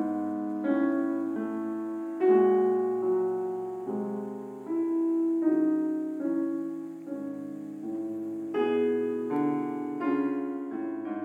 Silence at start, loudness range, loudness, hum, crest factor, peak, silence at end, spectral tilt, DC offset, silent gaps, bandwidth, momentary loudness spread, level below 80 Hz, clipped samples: 0 s; 4 LU; -29 LUFS; none; 16 dB; -12 dBFS; 0 s; -8.5 dB/octave; under 0.1%; none; 7 kHz; 11 LU; -86 dBFS; under 0.1%